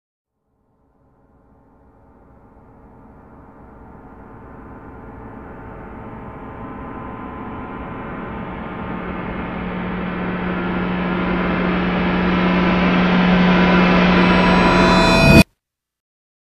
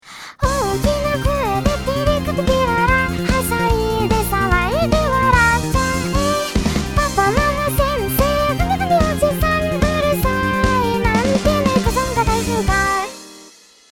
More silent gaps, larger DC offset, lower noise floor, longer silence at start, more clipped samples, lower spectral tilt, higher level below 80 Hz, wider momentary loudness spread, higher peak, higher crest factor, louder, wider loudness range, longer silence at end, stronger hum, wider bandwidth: neither; second, under 0.1% vs 0.2%; first, -74 dBFS vs -45 dBFS; first, 3.4 s vs 0.05 s; neither; first, -6.5 dB/octave vs -5 dB/octave; second, -34 dBFS vs -26 dBFS; first, 23 LU vs 4 LU; about the same, 0 dBFS vs 0 dBFS; about the same, 18 dB vs 16 dB; about the same, -16 LUFS vs -17 LUFS; first, 23 LU vs 1 LU; first, 1.15 s vs 0.45 s; neither; second, 13 kHz vs over 20 kHz